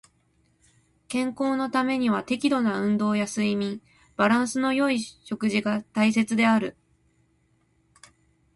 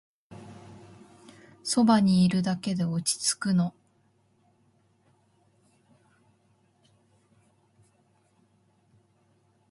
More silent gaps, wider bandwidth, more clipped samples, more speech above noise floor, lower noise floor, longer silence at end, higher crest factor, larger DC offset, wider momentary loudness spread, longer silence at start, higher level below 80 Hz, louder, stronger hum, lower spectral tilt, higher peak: neither; about the same, 11.5 kHz vs 11.5 kHz; neither; about the same, 43 dB vs 43 dB; about the same, -66 dBFS vs -67 dBFS; second, 1.85 s vs 6 s; about the same, 18 dB vs 22 dB; neither; second, 8 LU vs 28 LU; first, 1.1 s vs 0.3 s; about the same, -66 dBFS vs -66 dBFS; about the same, -25 LUFS vs -25 LUFS; neither; about the same, -5 dB/octave vs -5 dB/octave; about the same, -8 dBFS vs -10 dBFS